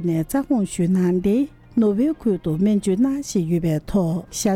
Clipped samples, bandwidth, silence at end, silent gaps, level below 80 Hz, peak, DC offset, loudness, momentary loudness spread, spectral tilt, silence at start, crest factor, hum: under 0.1%; 16.5 kHz; 0 s; none; -44 dBFS; -8 dBFS; under 0.1%; -21 LUFS; 4 LU; -7 dB/octave; 0 s; 12 dB; none